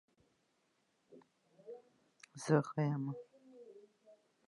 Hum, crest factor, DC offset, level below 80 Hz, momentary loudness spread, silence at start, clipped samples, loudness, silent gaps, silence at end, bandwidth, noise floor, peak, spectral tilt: none; 24 dB; under 0.1%; -88 dBFS; 26 LU; 1.1 s; under 0.1%; -37 LUFS; none; 0.35 s; 11 kHz; -79 dBFS; -18 dBFS; -7 dB/octave